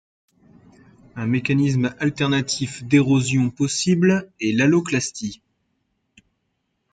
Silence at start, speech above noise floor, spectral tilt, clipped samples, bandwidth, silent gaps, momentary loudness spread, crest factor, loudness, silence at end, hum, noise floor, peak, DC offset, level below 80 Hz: 1.15 s; 54 dB; -5.5 dB/octave; under 0.1%; 9.4 kHz; none; 9 LU; 18 dB; -20 LUFS; 1.55 s; none; -73 dBFS; -4 dBFS; under 0.1%; -56 dBFS